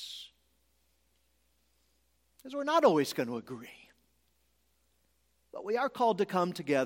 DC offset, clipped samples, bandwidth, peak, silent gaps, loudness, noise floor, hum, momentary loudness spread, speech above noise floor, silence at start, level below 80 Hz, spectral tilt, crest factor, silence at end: under 0.1%; under 0.1%; 16.5 kHz; -12 dBFS; none; -30 LUFS; -74 dBFS; none; 20 LU; 44 dB; 0 s; -76 dBFS; -5 dB/octave; 22 dB; 0 s